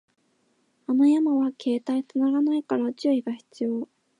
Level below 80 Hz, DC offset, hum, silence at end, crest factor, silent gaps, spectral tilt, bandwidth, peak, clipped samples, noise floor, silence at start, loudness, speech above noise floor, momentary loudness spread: -82 dBFS; under 0.1%; none; 0.35 s; 14 dB; none; -6 dB/octave; 10 kHz; -12 dBFS; under 0.1%; -69 dBFS; 0.9 s; -25 LUFS; 45 dB; 11 LU